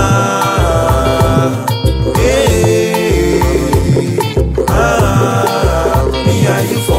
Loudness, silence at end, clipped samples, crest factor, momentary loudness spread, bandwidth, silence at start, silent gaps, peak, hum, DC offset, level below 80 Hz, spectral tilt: -12 LUFS; 0 s; under 0.1%; 10 dB; 3 LU; 16.5 kHz; 0 s; none; 0 dBFS; none; under 0.1%; -20 dBFS; -5.5 dB/octave